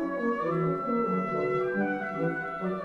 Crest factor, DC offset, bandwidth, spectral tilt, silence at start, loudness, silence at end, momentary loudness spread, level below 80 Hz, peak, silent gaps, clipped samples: 12 dB; under 0.1%; 7.2 kHz; -9 dB/octave; 0 s; -29 LUFS; 0 s; 3 LU; -64 dBFS; -16 dBFS; none; under 0.1%